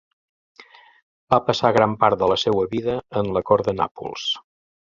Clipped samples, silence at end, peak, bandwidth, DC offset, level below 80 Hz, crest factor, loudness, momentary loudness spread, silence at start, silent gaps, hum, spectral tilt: under 0.1%; 0.55 s; 0 dBFS; 7.6 kHz; under 0.1%; -52 dBFS; 22 dB; -21 LUFS; 8 LU; 0.6 s; 1.02-1.27 s, 3.91-3.95 s; none; -5.5 dB/octave